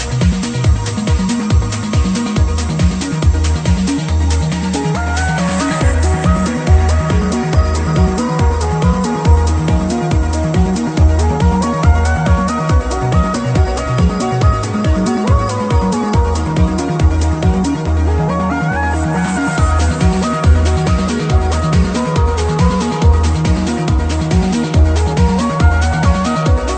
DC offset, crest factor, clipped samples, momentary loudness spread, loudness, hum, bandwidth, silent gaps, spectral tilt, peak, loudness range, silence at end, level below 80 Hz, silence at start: under 0.1%; 12 dB; under 0.1%; 3 LU; -14 LUFS; none; 9.2 kHz; none; -6.5 dB/octave; 0 dBFS; 1 LU; 0 s; -18 dBFS; 0 s